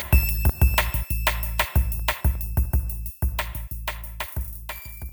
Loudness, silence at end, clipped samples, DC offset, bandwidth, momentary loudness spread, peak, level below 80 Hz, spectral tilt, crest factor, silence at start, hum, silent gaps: -25 LUFS; 0 s; under 0.1%; under 0.1%; over 20 kHz; 12 LU; -4 dBFS; -26 dBFS; -4.5 dB/octave; 20 dB; 0 s; none; none